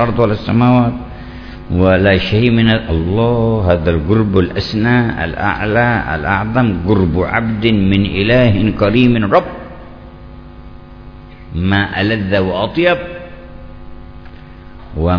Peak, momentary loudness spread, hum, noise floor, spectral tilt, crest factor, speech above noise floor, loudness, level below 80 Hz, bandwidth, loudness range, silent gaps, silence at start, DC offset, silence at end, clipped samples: 0 dBFS; 16 LU; none; -34 dBFS; -9 dB/octave; 14 dB; 21 dB; -13 LUFS; -30 dBFS; 5.4 kHz; 5 LU; none; 0 s; under 0.1%; 0 s; 0.2%